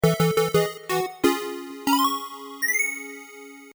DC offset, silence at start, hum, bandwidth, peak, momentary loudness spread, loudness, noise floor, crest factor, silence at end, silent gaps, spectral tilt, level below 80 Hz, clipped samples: under 0.1%; 0.05 s; none; over 20 kHz; -8 dBFS; 16 LU; -24 LUFS; -43 dBFS; 18 dB; 0 s; none; -4.5 dB/octave; -56 dBFS; under 0.1%